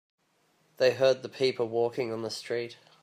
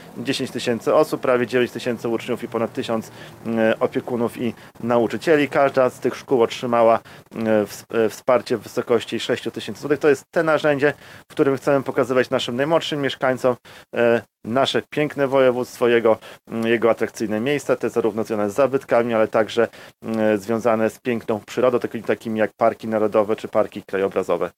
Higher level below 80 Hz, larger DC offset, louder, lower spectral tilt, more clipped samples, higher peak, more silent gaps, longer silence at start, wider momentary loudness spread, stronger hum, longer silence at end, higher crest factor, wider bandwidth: second, -80 dBFS vs -64 dBFS; neither; second, -29 LUFS vs -21 LUFS; about the same, -4.5 dB/octave vs -5.5 dB/octave; neither; second, -12 dBFS vs -4 dBFS; neither; first, 0.8 s vs 0 s; about the same, 10 LU vs 8 LU; neither; first, 0.3 s vs 0.1 s; about the same, 18 dB vs 18 dB; about the same, 15.5 kHz vs 16 kHz